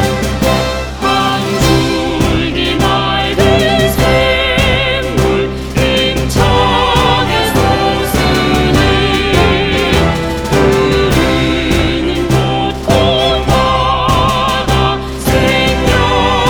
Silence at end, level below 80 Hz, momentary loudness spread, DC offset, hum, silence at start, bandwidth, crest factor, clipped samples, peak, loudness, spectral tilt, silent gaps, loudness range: 0 s; -22 dBFS; 4 LU; under 0.1%; none; 0 s; over 20 kHz; 12 dB; under 0.1%; 0 dBFS; -11 LUFS; -5 dB/octave; none; 1 LU